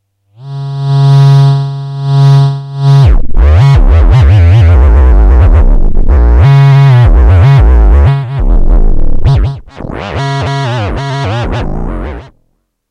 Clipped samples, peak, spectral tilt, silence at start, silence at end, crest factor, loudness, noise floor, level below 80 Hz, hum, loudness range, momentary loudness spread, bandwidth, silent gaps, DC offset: 2%; 0 dBFS; -8.5 dB/octave; 0.4 s; 0.65 s; 6 dB; -8 LUFS; -58 dBFS; -8 dBFS; none; 8 LU; 13 LU; 6.8 kHz; none; under 0.1%